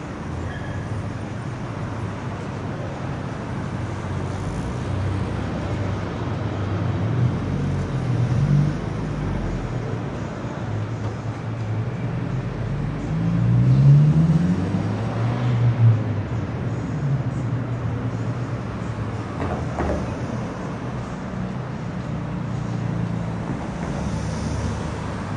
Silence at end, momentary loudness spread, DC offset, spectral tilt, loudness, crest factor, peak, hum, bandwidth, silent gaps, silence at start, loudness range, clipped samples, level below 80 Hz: 0 s; 11 LU; under 0.1%; -8 dB/octave; -24 LUFS; 18 dB; -4 dBFS; none; 10 kHz; none; 0 s; 9 LU; under 0.1%; -38 dBFS